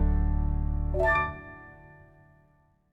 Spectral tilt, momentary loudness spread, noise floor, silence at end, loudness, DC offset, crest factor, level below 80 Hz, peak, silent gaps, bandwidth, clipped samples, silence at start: -8.5 dB/octave; 21 LU; -65 dBFS; 1.05 s; -28 LUFS; under 0.1%; 14 dB; -32 dBFS; -14 dBFS; none; 4.9 kHz; under 0.1%; 0 s